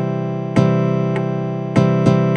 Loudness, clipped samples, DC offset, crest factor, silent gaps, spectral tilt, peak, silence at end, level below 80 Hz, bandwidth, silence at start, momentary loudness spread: -17 LUFS; under 0.1%; under 0.1%; 16 dB; none; -8.5 dB/octave; 0 dBFS; 0 s; -50 dBFS; 8.8 kHz; 0 s; 7 LU